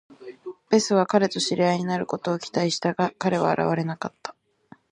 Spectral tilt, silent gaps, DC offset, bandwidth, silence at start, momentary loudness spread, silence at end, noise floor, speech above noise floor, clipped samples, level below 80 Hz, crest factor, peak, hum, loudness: -5 dB/octave; none; under 0.1%; 11 kHz; 0.1 s; 19 LU; 0.6 s; -54 dBFS; 31 dB; under 0.1%; -68 dBFS; 20 dB; -4 dBFS; none; -24 LUFS